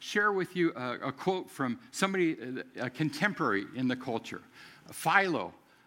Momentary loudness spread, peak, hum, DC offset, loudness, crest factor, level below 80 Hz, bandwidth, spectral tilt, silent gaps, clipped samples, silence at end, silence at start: 12 LU; -8 dBFS; none; under 0.1%; -31 LUFS; 24 dB; -78 dBFS; 16.5 kHz; -5 dB/octave; none; under 0.1%; 0.3 s; 0 s